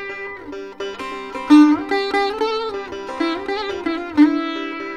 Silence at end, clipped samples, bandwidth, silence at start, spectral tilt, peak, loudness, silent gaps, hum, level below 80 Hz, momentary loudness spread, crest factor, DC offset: 0 s; under 0.1%; 9 kHz; 0 s; -4.5 dB/octave; -2 dBFS; -19 LUFS; none; none; -52 dBFS; 17 LU; 18 dB; 0.3%